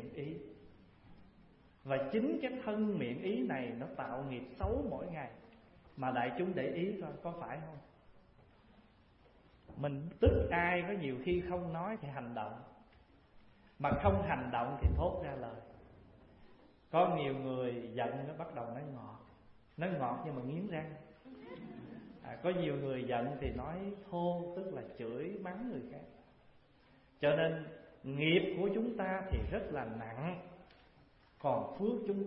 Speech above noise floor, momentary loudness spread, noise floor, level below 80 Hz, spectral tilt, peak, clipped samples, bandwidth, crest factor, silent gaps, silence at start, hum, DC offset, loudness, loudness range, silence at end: 29 dB; 18 LU; -66 dBFS; -50 dBFS; -5.5 dB/octave; -16 dBFS; under 0.1%; 5.6 kHz; 24 dB; none; 0 s; none; under 0.1%; -38 LUFS; 6 LU; 0 s